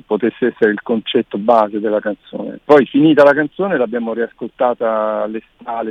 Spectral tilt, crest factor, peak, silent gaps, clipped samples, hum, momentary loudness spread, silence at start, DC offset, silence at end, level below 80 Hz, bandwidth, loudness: -7.5 dB/octave; 16 dB; 0 dBFS; none; under 0.1%; none; 14 LU; 0.1 s; under 0.1%; 0 s; -60 dBFS; 7 kHz; -15 LUFS